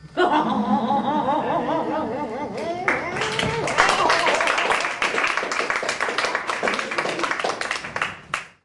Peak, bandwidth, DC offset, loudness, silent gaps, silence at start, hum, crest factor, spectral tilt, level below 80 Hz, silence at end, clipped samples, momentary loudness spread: 0 dBFS; 11.5 kHz; under 0.1%; -22 LUFS; none; 0 s; none; 22 dB; -3.5 dB/octave; -54 dBFS; 0.15 s; under 0.1%; 8 LU